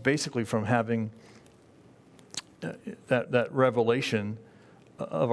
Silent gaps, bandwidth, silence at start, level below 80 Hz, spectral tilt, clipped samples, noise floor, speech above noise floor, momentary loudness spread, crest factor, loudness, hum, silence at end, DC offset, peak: none; 11 kHz; 0 s; -70 dBFS; -5.5 dB/octave; under 0.1%; -56 dBFS; 29 dB; 15 LU; 22 dB; -29 LUFS; none; 0 s; under 0.1%; -8 dBFS